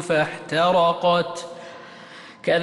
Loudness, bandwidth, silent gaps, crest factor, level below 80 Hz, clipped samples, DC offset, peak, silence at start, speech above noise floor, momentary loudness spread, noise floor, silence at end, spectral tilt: -21 LUFS; 11.5 kHz; none; 14 dB; -62 dBFS; under 0.1%; under 0.1%; -10 dBFS; 0 s; 22 dB; 22 LU; -43 dBFS; 0 s; -5 dB/octave